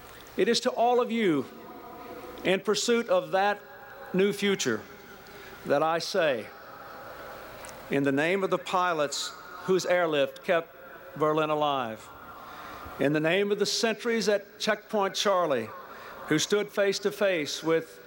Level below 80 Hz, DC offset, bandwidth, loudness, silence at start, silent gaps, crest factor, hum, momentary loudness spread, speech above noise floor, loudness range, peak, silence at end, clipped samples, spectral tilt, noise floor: -66 dBFS; under 0.1%; 19 kHz; -27 LUFS; 0 s; none; 16 dB; none; 18 LU; 20 dB; 3 LU; -12 dBFS; 0 s; under 0.1%; -4 dB/octave; -47 dBFS